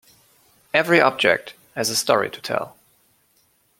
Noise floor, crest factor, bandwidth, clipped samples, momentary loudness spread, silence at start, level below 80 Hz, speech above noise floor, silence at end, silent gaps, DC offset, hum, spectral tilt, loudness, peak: -63 dBFS; 22 dB; 16.5 kHz; under 0.1%; 11 LU; 0.75 s; -66 dBFS; 43 dB; 1.1 s; none; under 0.1%; none; -3 dB/octave; -20 LUFS; 0 dBFS